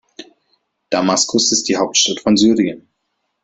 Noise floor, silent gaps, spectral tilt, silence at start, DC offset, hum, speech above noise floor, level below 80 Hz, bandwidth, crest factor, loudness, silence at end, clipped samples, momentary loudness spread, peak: -71 dBFS; none; -2.5 dB/octave; 0.2 s; under 0.1%; none; 56 dB; -56 dBFS; 8.4 kHz; 16 dB; -15 LUFS; 0.65 s; under 0.1%; 8 LU; -2 dBFS